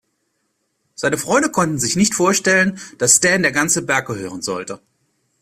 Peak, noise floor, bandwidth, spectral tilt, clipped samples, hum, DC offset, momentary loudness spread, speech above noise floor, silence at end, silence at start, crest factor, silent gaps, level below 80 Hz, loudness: 0 dBFS; -70 dBFS; 16 kHz; -3 dB/octave; under 0.1%; none; under 0.1%; 13 LU; 52 dB; 0.65 s; 1 s; 18 dB; none; -54 dBFS; -16 LUFS